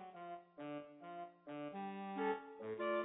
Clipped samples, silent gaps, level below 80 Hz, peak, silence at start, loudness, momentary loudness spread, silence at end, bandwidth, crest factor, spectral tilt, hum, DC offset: under 0.1%; none; under -90 dBFS; -28 dBFS; 0 s; -47 LUFS; 11 LU; 0 s; 3.9 kHz; 18 dB; -1.5 dB/octave; none; under 0.1%